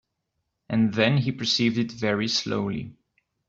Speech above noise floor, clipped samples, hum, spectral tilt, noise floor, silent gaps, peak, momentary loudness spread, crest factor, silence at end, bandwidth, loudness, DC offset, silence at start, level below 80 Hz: 55 dB; under 0.1%; none; -5 dB/octave; -79 dBFS; none; -6 dBFS; 9 LU; 20 dB; 0.55 s; 7.8 kHz; -24 LUFS; under 0.1%; 0.7 s; -60 dBFS